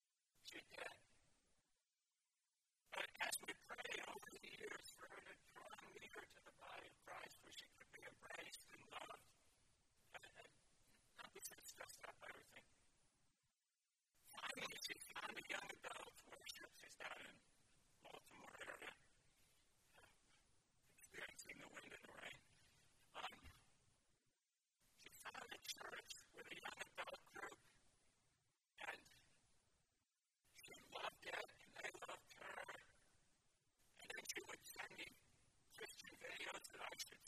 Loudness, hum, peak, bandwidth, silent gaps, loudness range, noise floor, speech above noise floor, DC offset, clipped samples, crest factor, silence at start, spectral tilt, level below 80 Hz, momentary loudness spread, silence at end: -55 LUFS; none; -32 dBFS; 14.5 kHz; none; 8 LU; under -90 dBFS; over 34 dB; under 0.1%; under 0.1%; 26 dB; 0.35 s; -1 dB/octave; -84 dBFS; 13 LU; 0 s